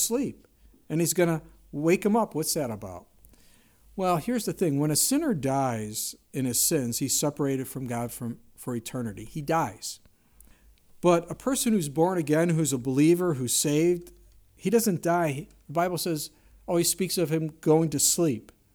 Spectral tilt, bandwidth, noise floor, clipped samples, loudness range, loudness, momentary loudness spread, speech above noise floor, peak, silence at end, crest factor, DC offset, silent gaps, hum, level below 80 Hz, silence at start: -4.5 dB/octave; over 20 kHz; -58 dBFS; under 0.1%; 5 LU; -26 LUFS; 13 LU; 32 dB; -10 dBFS; 0.35 s; 18 dB; under 0.1%; none; none; -58 dBFS; 0 s